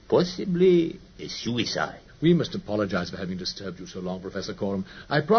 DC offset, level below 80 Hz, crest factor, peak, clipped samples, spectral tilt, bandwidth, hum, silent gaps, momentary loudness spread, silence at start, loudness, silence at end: under 0.1%; -54 dBFS; 18 dB; -8 dBFS; under 0.1%; -6 dB/octave; 6.6 kHz; none; none; 13 LU; 0.1 s; -27 LUFS; 0 s